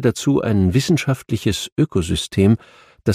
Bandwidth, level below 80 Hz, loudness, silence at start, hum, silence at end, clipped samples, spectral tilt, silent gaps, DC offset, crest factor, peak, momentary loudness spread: 15.5 kHz; -40 dBFS; -19 LUFS; 0 s; none; 0 s; under 0.1%; -6 dB/octave; 1.72-1.76 s; under 0.1%; 16 dB; -2 dBFS; 5 LU